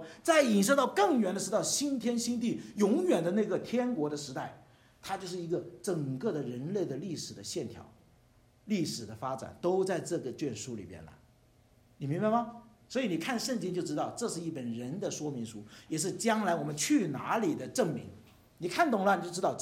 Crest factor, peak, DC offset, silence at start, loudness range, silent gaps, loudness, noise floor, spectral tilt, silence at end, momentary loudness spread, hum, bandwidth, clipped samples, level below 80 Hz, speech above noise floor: 20 dB; -12 dBFS; under 0.1%; 0 s; 7 LU; none; -32 LUFS; -64 dBFS; -4.5 dB/octave; 0 s; 13 LU; none; 16 kHz; under 0.1%; -70 dBFS; 32 dB